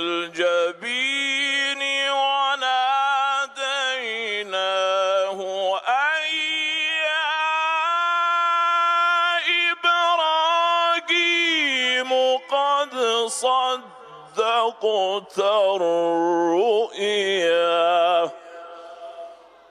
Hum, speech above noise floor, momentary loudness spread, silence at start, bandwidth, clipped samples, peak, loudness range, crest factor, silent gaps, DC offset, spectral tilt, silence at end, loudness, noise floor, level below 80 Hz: none; 22 dB; 6 LU; 0 s; 13 kHz; under 0.1%; -8 dBFS; 3 LU; 14 dB; none; under 0.1%; -1.5 dB/octave; 0.35 s; -20 LUFS; -43 dBFS; -80 dBFS